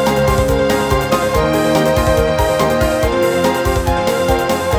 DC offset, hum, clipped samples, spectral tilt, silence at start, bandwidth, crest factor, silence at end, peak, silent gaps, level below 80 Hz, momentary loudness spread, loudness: under 0.1%; none; under 0.1%; -5 dB/octave; 0 s; 19 kHz; 14 dB; 0 s; 0 dBFS; none; -24 dBFS; 2 LU; -14 LUFS